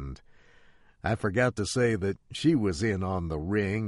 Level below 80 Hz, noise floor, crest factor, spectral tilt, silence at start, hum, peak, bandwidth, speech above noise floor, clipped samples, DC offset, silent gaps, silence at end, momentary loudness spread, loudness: -48 dBFS; -57 dBFS; 16 dB; -6 dB/octave; 0 s; none; -12 dBFS; 11.5 kHz; 30 dB; under 0.1%; under 0.1%; none; 0 s; 8 LU; -28 LUFS